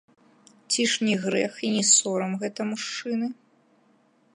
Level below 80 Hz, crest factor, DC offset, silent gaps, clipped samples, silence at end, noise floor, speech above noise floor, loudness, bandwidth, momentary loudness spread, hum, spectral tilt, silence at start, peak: -80 dBFS; 22 dB; under 0.1%; none; under 0.1%; 1 s; -63 dBFS; 38 dB; -24 LUFS; 11.5 kHz; 12 LU; none; -2.5 dB/octave; 0.7 s; -6 dBFS